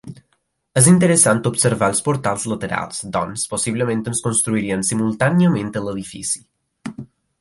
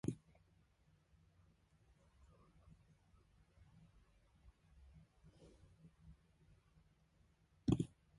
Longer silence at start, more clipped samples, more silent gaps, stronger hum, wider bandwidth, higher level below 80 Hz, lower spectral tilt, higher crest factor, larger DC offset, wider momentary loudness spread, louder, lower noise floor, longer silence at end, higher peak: about the same, 0.05 s vs 0.05 s; neither; neither; neither; about the same, 12 kHz vs 11 kHz; first, -52 dBFS vs -66 dBFS; second, -4.5 dB/octave vs -8 dB/octave; second, 20 dB vs 30 dB; neither; second, 13 LU vs 28 LU; first, -18 LUFS vs -43 LUFS; second, -68 dBFS vs -75 dBFS; about the same, 0.35 s vs 0.3 s; first, 0 dBFS vs -22 dBFS